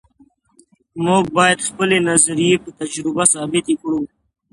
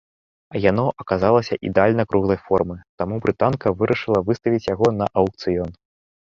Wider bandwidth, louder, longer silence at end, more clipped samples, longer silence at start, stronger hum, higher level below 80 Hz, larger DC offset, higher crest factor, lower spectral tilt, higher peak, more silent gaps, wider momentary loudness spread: first, 11.5 kHz vs 7.4 kHz; first, -16 LUFS vs -20 LUFS; about the same, 0.45 s vs 0.5 s; neither; first, 0.95 s vs 0.5 s; neither; second, -54 dBFS vs -46 dBFS; neither; about the same, 18 dB vs 18 dB; second, -3 dB/octave vs -8 dB/octave; about the same, 0 dBFS vs -2 dBFS; second, none vs 2.89-2.98 s; first, 10 LU vs 7 LU